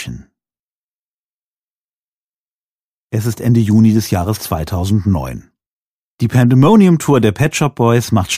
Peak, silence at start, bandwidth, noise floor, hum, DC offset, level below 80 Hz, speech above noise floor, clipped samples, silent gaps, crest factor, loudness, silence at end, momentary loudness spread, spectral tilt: 0 dBFS; 0 s; 15.5 kHz; under -90 dBFS; none; under 0.1%; -40 dBFS; over 78 dB; under 0.1%; 0.59-3.08 s, 5.66-6.18 s; 14 dB; -13 LUFS; 0 s; 11 LU; -6.5 dB/octave